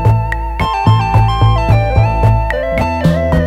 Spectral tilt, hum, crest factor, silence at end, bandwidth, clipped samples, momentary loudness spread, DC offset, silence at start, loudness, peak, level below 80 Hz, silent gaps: -7.5 dB/octave; none; 12 dB; 0 s; 8.4 kHz; under 0.1%; 5 LU; under 0.1%; 0 s; -13 LUFS; 0 dBFS; -20 dBFS; none